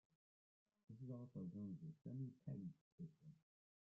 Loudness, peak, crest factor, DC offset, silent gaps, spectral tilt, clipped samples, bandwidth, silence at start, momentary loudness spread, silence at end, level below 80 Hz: -55 LUFS; -40 dBFS; 16 dB; under 0.1%; 2.81-2.98 s; -12.5 dB/octave; under 0.1%; 5.8 kHz; 0.9 s; 10 LU; 0.5 s; -86 dBFS